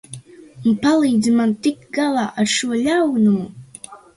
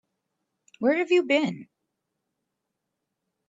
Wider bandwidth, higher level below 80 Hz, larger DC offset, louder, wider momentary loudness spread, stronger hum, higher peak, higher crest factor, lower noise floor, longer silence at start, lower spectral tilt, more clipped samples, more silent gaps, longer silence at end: first, 11.5 kHz vs 7.8 kHz; first, -58 dBFS vs -80 dBFS; neither; first, -18 LUFS vs -24 LUFS; first, 21 LU vs 10 LU; neither; first, -4 dBFS vs -10 dBFS; second, 14 dB vs 20 dB; second, -40 dBFS vs -82 dBFS; second, 0.1 s vs 0.8 s; about the same, -4.5 dB/octave vs -5.5 dB/octave; neither; neither; second, 0.2 s vs 1.85 s